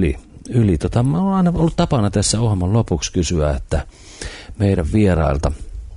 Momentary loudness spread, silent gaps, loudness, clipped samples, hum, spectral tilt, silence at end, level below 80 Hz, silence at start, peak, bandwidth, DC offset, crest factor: 15 LU; none; -18 LUFS; under 0.1%; none; -6 dB/octave; 0 s; -28 dBFS; 0 s; -4 dBFS; 11 kHz; under 0.1%; 14 dB